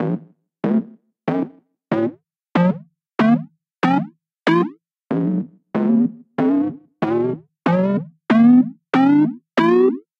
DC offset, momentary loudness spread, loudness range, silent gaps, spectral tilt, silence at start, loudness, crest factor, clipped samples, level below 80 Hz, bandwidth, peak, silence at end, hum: under 0.1%; 11 LU; 5 LU; none; -8.5 dB/octave; 0 s; -19 LUFS; 16 dB; under 0.1%; -66 dBFS; 6.6 kHz; -4 dBFS; 0.2 s; none